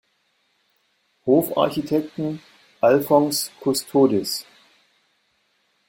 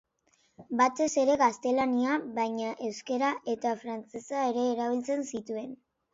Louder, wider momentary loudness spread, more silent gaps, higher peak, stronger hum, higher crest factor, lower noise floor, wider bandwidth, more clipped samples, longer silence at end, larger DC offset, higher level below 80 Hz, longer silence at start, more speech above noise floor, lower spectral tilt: first, -21 LUFS vs -30 LUFS; about the same, 11 LU vs 11 LU; neither; first, -2 dBFS vs -14 dBFS; neither; about the same, 20 dB vs 16 dB; about the same, -68 dBFS vs -70 dBFS; first, 16.5 kHz vs 8 kHz; neither; first, 1.45 s vs 0.4 s; neither; first, -64 dBFS vs -72 dBFS; first, 1.25 s vs 0.6 s; first, 48 dB vs 41 dB; about the same, -5 dB/octave vs -4 dB/octave